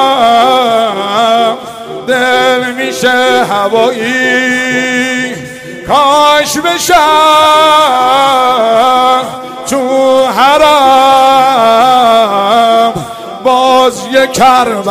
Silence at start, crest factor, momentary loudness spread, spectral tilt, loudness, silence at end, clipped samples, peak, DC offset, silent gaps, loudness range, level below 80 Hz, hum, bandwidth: 0 s; 8 dB; 9 LU; -2.5 dB/octave; -8 LUFS; 0 s; 0.5%; 0 dBFS; under 0.1%; none; 3 LU; -44 dBFS; none; 16.5 kHz